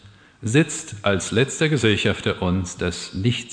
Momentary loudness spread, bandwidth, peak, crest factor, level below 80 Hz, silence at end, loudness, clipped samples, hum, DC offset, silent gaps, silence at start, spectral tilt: 7 LU; 10.5 kHz; -4 dBFS; 18 dB; -48 dBFS; 0 s; -22 LUFS; under 0.1%; none; under 0.1%; none; 0.05 s; -5 dB/octave